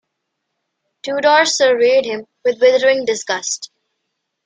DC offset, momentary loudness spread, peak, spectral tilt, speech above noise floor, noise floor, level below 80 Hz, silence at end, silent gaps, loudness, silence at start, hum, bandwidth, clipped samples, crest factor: under 0.1%; 13 LU; -2 dBFS; -1 dB/octave; 60 dB; -75 dBFS; -68 dBFS; 0.8 s; none; -15 LUFS; 1.05 s; none; 9.6 kHz; under 0.1%; 16 dB